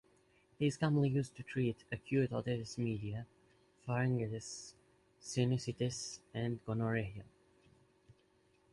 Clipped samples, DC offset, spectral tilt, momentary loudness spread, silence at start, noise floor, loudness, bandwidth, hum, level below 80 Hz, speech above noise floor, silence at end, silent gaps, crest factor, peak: under 0.1%; under 0.1%; -6 dB/octave; 14 LU; 0.6 s; -72 dBFS; -38 LUFS; 11.5 kHz; none; -66 dBFS; 35 dB; 1.5 s; none; 18 dB; -20 dBFS